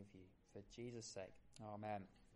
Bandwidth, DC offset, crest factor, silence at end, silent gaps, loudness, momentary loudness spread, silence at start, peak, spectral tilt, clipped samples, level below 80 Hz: 11 kHz; under 0.1%; 18 dB; 0 s; none; -54 LUFS; 13 LU; 0 s; -36 dBFS; -5 dB/octave; under 0.1%; -76 dBFS